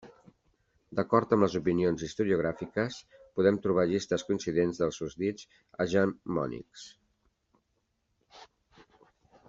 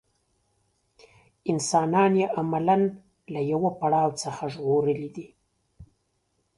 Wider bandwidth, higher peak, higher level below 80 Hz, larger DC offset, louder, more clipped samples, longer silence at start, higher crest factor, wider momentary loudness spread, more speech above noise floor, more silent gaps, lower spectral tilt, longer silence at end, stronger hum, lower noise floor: second, 7.8 kHz vs 11.5 kHz; about the same, -8 dBFS vs -8 dBFS; about the same, -62 dBFS vs -64 dBFS; neither; second, -30 LUFS vs -25 LUFS; neither; second, 0.05 s vs 1.45 s; about the same, 22 dB vs 18 dB; first, 16 LU vs 11 LU; about the same, 48 dB vs 49 dB; neither; about the same, -6.5 dB/octave vs -6 dB/octave; first, 1.05 s vs 0.75 s; neither; first, -78 dBFS vs -73 dBFS